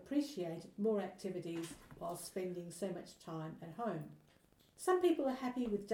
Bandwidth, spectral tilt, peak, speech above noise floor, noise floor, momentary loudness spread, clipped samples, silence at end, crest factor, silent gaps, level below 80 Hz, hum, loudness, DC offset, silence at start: 17.5 kHz; -5.5 dB/octave; -22 dBFS; 30 dB; -69 dBFS; 14 LU; under 0.1%; 0 s; 18 dB; none; -72 dBFS; none; -41 LUFS; under 0.1%; 0 s